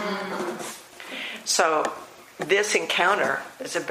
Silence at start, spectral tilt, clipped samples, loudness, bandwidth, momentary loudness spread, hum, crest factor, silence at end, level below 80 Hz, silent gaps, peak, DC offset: 0 s; -1.5 dB/octave; under 0.1%; -24 LUFS; 15.5 kHz; 16 LU; none; 22 dB; 0 s; -72 dBFS; none; -4 dBFS; under 0.1%